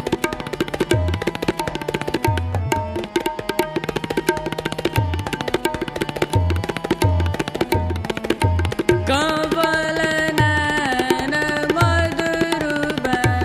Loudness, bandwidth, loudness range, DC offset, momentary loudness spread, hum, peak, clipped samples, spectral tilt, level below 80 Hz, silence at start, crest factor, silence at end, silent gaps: -21 LUFS; 15.5 kHz; 4 LU; under 0.1%; 7 LU; none; 0 dBFS; under 0.1%; -5.5 dB/octave; -36 dBFS; 0 s; 20 dB; 0 s; none